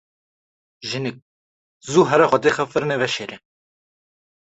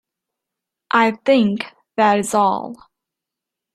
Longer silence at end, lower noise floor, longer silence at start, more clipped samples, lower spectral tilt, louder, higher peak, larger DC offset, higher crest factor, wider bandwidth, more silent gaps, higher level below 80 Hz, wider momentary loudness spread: first, 1.2 s vs 1 s; first, under -90 dBFS vs -84 dBFS; second, 0.8 s vs 0.95 s; neither; about the same, -5 dB/octave vs -4.5 dB/octave; about the same, -19 LUFS vs -18 LUFS; about the same, -2 dBFS vs -2 dBFS; neither; about the same, 20 dB vs 18 dB; second, 8.2 kHz vs 14 kHz; first, 1.22-1.80 s vs none; about the same, -62 dBFS vs -64 dBFS; first, 17 LU vs 11 LU